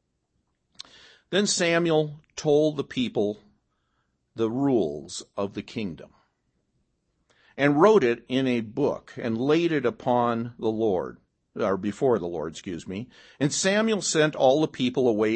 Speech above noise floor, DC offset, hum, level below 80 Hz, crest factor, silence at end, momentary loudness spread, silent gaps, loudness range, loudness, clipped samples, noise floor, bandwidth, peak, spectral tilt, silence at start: 50 dB; under 0.1%; none; -64 dBFS; 20 dB; 0 s; 14 LU; none; 7 LU; -25 LUFS; under 0.1%; -74 dBFS; 8.8 kHz; -6 dBFS; -4.5 dB/octave; 1.3 s